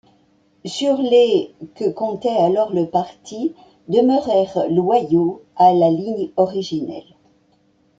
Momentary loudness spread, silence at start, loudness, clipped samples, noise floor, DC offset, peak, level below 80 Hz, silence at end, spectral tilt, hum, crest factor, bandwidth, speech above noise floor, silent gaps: 12 LU; 0.65 s; -18 LUFS; under 0.1%; -59 dBFS; under 0.1%; -2 dBFS; -62 dBFS; 1 s; -6.5 dB/octave; none; 16 dB; 9.2 kHz; 41 dB; none